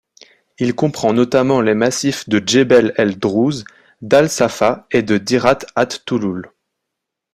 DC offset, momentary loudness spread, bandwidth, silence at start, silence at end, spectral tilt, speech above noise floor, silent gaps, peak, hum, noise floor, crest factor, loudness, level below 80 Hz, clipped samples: under 0.1%; 8 LU; 15 kHz; 0.6 s; 0.9 s; -5 dB/octave; 64 dB; none; 0 dBFS; none; -79 dBFS; 16 dB; -16 LUFS; -54 dBFS; under 0.1%